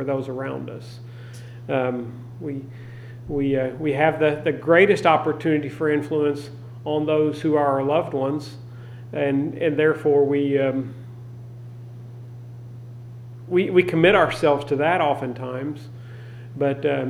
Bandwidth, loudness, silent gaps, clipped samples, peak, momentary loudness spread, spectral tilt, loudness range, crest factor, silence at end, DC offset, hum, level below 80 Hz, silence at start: 12.5 kHz; -21 LUFS; none; under 0.1%; -2 dBFS; 21 LU; -7 dB/octave; 8 LU; 20 dB; 0 s; under 0.1%; none; -56 dBFS; 0 s